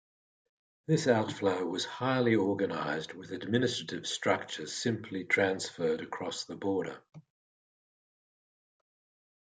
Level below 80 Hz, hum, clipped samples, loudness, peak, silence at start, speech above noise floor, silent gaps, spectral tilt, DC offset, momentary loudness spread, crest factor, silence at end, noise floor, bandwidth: -78 dBFS; none; under 0.1%; -32 LUFS; -12 dBFS; 0.9 s; over 58 dB; none; -4.5 dB/octave; under 0.1%; 10 LU; 22 dB; 2.35 s; under -90 dBFS; 9.6 kHz